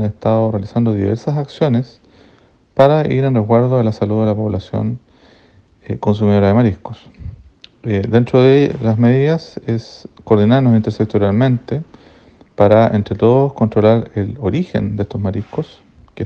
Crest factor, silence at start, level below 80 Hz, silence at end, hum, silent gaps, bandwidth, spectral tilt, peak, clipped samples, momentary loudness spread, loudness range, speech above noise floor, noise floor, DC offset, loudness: 14 dB; 0 s; -46 dBFS; 0 s; none; none; 6.8 kHz; -9.5 dB/octave; 0 dBFS; under 0.1%; 14 LU; 3 LU; 36 dB; -50 dBFS; under 0.1%; -15 LUFS